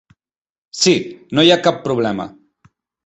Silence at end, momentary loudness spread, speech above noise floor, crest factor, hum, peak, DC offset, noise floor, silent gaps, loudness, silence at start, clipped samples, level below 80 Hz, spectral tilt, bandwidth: 0.75 s; 16 LU; over 74 dB; 18 dB; none; 0 dBFS; under 0.1%; under -90 dBFS; none; -16 LUFS; 0.75 s; under 0.1%; -56 dBFS; -4 dB/octave; 8.4 kHz